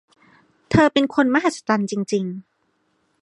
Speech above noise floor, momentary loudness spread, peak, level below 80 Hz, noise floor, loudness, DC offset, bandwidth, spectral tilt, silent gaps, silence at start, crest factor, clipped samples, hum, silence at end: 48 dB; 9 LU; -2 dBFS; -50 dBFS; -67 dBFS; -20 LUFS; under 0.1%; 11.5 kHz; -5.5 dB/octave; none; 0.7 s; 20 dB; under 0.1%; none; 0.85 s